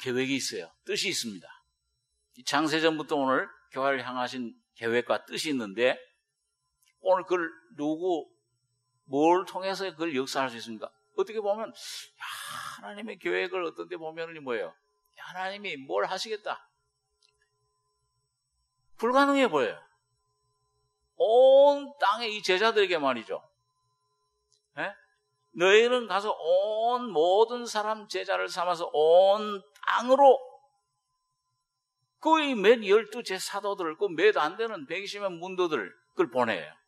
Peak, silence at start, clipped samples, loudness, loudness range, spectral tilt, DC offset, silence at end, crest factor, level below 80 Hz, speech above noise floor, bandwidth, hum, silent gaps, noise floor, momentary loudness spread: -6 dBFS; 0 s; under 0.1%; -27 LUFS; 10 LU; -3.5 dB/octave; under 0.1%; 0.15 s; 22 dB; -84 dBFS; 55 dB; 13 kHz; none; none; -82 dBFS; 17 LU